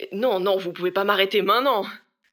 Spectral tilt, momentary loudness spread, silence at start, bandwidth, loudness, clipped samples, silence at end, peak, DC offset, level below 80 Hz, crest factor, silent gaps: -5 dB/octave; 6 LU; 0 s; 19 kHz; -22 LUFS; under 0.1%; 0.35 s; -4 dBFS; under 0.1%; -82 dBFS; 18 dB; none